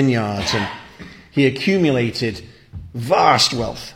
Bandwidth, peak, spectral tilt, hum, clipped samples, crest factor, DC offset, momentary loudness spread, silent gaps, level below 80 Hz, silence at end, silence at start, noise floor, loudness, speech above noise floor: 16 kHz; 0 dBFS; -4.5 dB/octave; none; under 0.1%; 18 dB; under 0.1%; 21 LU; none; -46 dBFS; 0 s; 0 s; -40 dBFS; -18 LUFS; 22 dB